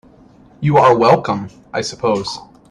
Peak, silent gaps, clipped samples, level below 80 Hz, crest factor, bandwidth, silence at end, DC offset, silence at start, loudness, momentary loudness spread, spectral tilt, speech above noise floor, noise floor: 0 dBFS; none; under 0.1%; -50 dBFS; 16 dB; 11 kHz; 0.3 s; under 0.1%; 0.6 s; -15 LUFS; 15 LU; -6 dB/octave; 31 dB; -46 dBFS